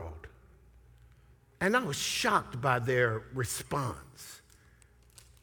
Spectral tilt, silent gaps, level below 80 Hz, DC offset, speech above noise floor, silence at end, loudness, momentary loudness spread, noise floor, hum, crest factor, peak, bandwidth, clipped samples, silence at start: -4 dB/octave; none; -58 dBFS; under 0.1%; 30 dB; 1.05 s; -30 LUFS; 20 LU; -61 dBFS; none; 22 dB; -12 dBFS; over 20 kHz; under 0.1%; 0 s